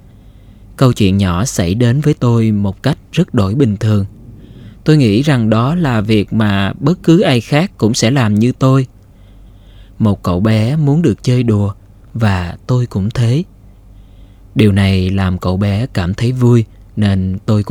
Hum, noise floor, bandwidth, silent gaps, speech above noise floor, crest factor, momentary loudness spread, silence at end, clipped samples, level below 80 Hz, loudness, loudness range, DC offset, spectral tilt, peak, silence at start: none; -40 dBFS; 15 kHz; none; 28 dB; 14 dB; 6 LU; 0 s; under 0.1%; -38 dBFS; -13 LUFS; 3 LU; under 0.1%; -7 dB/octave; 0 dBFS; 0.7 s